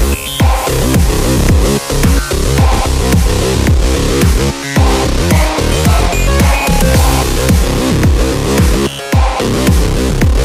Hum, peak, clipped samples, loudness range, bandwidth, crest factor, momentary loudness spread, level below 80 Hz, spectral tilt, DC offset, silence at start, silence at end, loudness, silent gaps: none; 0 dBFS; under 0.1%; 1 LU; 16 kHz; 10 dB; 3 LU; -14 dBFS; -5 dB/octave; under 0.1%; 0 s; 0 s; -12 LUFS; none